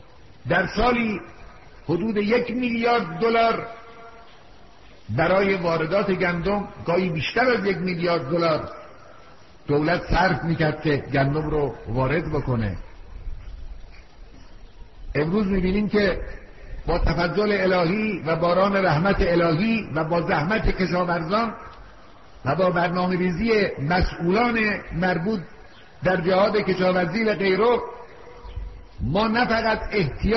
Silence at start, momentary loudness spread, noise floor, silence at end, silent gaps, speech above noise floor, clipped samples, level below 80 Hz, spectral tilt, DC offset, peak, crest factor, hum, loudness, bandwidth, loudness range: 0.45 s; 18 LU; -49 dBFS; 0 s; none; 28 dB; under 0.1%; -36 dBFS; -5 dB/octave; 0.4%; -8 dBFS; 16 dB; none; -22 LUFS; 6 kHz; 5 LU